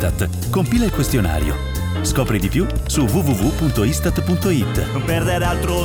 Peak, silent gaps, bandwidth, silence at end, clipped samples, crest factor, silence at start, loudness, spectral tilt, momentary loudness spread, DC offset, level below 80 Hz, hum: -6 dBFS; none; 20 kHz; 0 s; under 0.1%; 12 dB; 0 s; -19 LUFS; -5.5 dB/octave; 4 LU; 0.1%; -26 dBFS; none